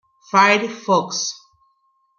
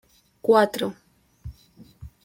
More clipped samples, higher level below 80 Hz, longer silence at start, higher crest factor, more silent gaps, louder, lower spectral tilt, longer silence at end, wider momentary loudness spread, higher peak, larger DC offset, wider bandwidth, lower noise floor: neither; second, -72 dBFS vs -52 dBFS; about the same, 0.35 s vs 0.45 s; about the same, 20 dB vs 22 dB; neither; first, -18 LUFS vs -22 LUFS; second, -3 dB/octave vs -5 dB/octave; first, 0.8 s vs 0.15 s; second, 12 LU vs 25 LU; about the same, -2 dBFS vs -4 dBFS; neither; second, 7.2 kHz vs 16.5 kHz; first, -64 dBFS vs -52 dBFS